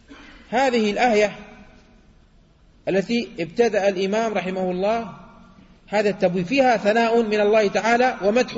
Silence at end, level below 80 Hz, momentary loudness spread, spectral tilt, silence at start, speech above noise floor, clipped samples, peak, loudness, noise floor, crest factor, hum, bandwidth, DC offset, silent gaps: 0 s; -54 dBFS; 7 LU; -5 dB/octave; 0.1 s; 34 dB; under 0.1%; -6 dBFS; -20 LUFS; -54 dBFS; 16 dB; none; 8 kHz; under 0.1%; none